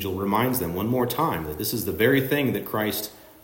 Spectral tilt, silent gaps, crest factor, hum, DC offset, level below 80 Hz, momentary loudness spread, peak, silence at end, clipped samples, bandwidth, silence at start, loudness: -5 dB/octave; none; 16 dB; none; under 0.1%; -52 dBFS; 7 LU; -8 dBFS; 0.1 s; under 0.1%; 16.5 kHz; 0 s; -24 LUFS